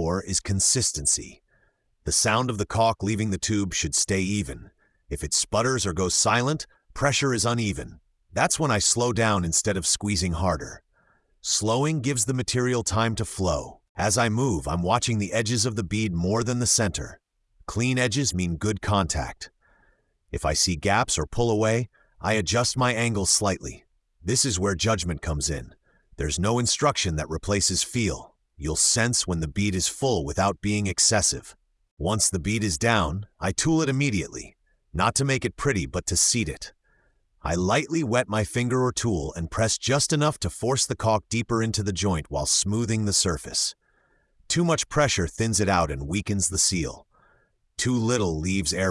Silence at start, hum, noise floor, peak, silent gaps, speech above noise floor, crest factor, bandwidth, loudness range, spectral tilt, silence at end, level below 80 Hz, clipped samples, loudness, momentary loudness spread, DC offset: 0 s; none; -66 dBFS; -6 dBFS; 13.89-13.95 s, 31.91-31.97 s; 42 dB; 18 dB; 12 kHz; 2 LU; -3.5 dB/octave; 0 s; -44 dBFS; under 0.1%; -24 LUFS; 10 LU; under 0.1%